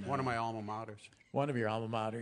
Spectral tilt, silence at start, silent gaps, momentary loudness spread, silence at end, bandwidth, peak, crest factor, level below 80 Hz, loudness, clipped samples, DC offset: -6.5 dB/octave; 0 s; none; 10 LU; 0 s; 10.5 kHz; -20 dBFS; 16 dB; -76 dBFS; -37 LUFS; under 0.1%; under 0.1%